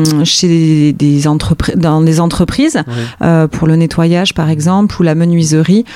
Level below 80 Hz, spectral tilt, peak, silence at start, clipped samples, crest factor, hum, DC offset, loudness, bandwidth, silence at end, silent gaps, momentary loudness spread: -32 dBFS; -6 dB/octave; 0 dBFS; 0 s; under 0.1%; 10 dB; none; under 0.1%; -10 LUFS; 13 kHz; 0 s; none; 4 LU